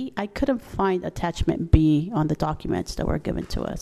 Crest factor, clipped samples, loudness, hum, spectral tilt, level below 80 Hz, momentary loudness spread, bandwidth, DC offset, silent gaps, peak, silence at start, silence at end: 18 dB; under 0.1%; -25 LUFS; none; -7 dB/octave; -32 dBFS; 9 LU; 14 kHz; under 0.1%; none; -6 dBFS; 0 s; 0 s